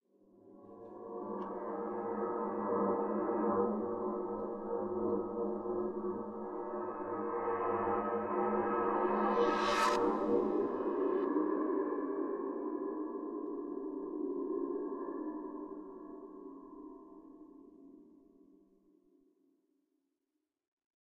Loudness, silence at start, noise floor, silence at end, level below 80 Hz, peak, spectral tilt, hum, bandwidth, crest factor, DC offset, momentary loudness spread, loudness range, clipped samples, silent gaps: -36 LUFS; 0.45 s; -87 dBFS; 3.1 s; -70 dBFS; -20 dBFS; -6 dB/octave; none; 9.6 kHz; 18 dB; under 0.1%; 18 LU; 14 LU; under 0.1%; none